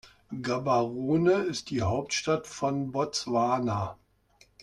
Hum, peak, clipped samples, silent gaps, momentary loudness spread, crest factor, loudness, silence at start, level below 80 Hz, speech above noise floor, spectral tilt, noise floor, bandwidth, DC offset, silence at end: none; -12 dBFS; under 0.1%; none; 7 LU; 16 dB; -28 LUFS; 0.05 s; -62 dBFS; 35 dB; -5 dB/octave; -63 dBFS; 12 kHz; under 0.1%; 0.7 s